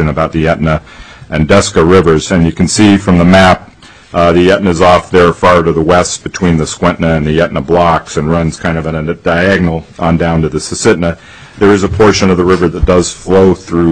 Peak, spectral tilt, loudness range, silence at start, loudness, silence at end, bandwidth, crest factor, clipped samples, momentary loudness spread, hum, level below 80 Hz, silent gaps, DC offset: 0 dBFS; -5.5 dB/octave; 4 LU; 0 s; -9 LUFS; 0 s; 10.5 kHz; 10 dB; 0.2%; 8 LU; none; -28 dBFS; none; 0.7%